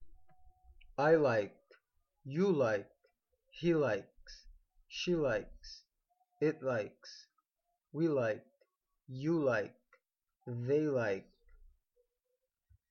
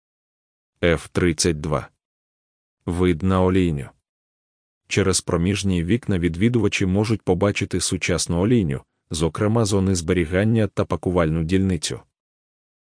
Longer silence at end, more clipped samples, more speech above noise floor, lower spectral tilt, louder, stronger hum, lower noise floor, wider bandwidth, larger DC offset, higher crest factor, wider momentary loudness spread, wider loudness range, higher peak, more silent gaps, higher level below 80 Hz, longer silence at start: first, 1.7 s vs 0.95 s; neither; second, 53 dB vs over 70 dB; first, -7 dB/octave vs -5.5 dB/octave; second, -35 LUFS vs -21 LUFS; neither; second, -86 dBFS vs under -90 dBFS; second, 7 kHz vs 10.5 kHz; neither; about the same, 20 dB vs 18 dB; first, 22 LU vs 7 LU; about the same, 4 LU vs 3 LU; second, -18 dBFS vs -4 dBFS; second, none vs 2.05-2.77 s, 4.09-4.81 s; second, -66 dBFS vs -42 dBFS; second, 0 s vs 0.8 s